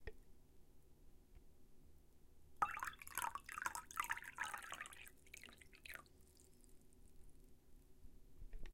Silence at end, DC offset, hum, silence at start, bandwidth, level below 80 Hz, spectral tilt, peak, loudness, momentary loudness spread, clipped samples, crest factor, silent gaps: 0 s; under 0.1%; none; 0 s; 16.5 kHz; -62 dBFS; -1.5 dB/octave; -22 dBFS; -48 LUFS; 25 LU; under 0.1%; 30 dB; none